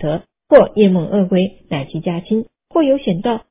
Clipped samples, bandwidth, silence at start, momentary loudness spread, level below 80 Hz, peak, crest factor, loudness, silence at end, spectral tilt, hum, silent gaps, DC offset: 0.2%; 4 kHz; 0 s; 11 LU; -48 dBFS; 0 dBFS; 16 dB; -16 LUFS; 0.1 s; -11.5 dB/octave; none; none; under 0.1%